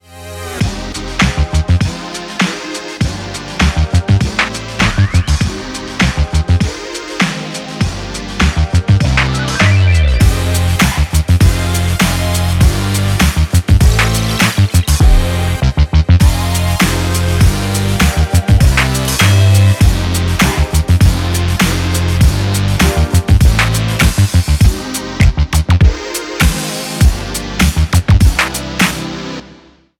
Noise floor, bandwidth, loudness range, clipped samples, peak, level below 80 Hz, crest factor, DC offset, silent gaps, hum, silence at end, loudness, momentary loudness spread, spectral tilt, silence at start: -42 dBFS; 17 kHz; 4 LU; under 0.1%; 0 dBFS; -16 dBFS; 12 dB; under 0.1%; none; none; 0.45 s; -13 LUFS; 9 LU; -5 dB/octave; 0.1 s